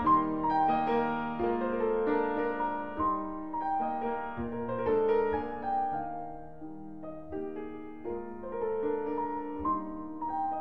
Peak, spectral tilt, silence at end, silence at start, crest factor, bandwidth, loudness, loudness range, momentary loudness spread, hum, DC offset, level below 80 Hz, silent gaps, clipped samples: -14 dBFS; -9 dB/octave; 0 s; 0 s; 18 dB; 5.4 kHz; -32 LUFS; 7 LU; 14 LU; none; 0.5%; -56 dBFS; none; under 0.1%